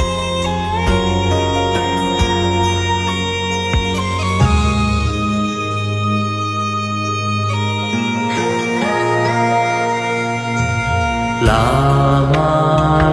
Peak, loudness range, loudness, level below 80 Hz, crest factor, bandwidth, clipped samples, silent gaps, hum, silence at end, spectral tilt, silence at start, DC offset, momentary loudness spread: -2 dBFS; 3 LU; -16 LUFS; -28 dBFS; 14 dB; 11 kHz; under 0.1%; none; none; 0 s; -5.5 dB/octave; 0 s; under 0.1%; 5 LU